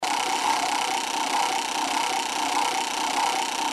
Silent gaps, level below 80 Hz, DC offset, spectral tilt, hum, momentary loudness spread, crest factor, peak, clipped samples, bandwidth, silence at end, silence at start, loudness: none; -66 dBFS; under 0.1%; 0 dB/octave; none; 2 LU; 14 dB; -10 dBFS; under 0.1%; 14.5 kHz; 0 s; 0 s; -24 LUFS